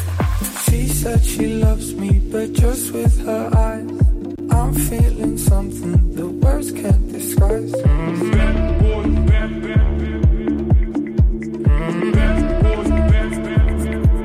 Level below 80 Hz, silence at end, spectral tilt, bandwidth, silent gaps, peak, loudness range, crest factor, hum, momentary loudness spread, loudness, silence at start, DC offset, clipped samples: -18 dBFS; 0 s; -6.5 dB/octave; 16 kHz; none; -4 dBFS; 1 LU; 12 dB; none; 3 LU; -18 LUFS; 0 s; under 0.1%; under 0.1%